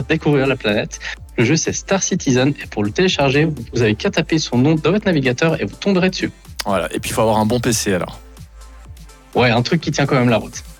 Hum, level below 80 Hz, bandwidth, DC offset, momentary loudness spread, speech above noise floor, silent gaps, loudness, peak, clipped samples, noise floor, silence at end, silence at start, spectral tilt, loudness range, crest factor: none; -40 dBFS; 19 kHz; under 0.1%; 7 LU; 22 dB; none; -17 LUFS; -4 dBFS; under 0.1%; -39 dBFS; 0.05 s; 0 s; -5 dB/octave; 3 LU; 14 dB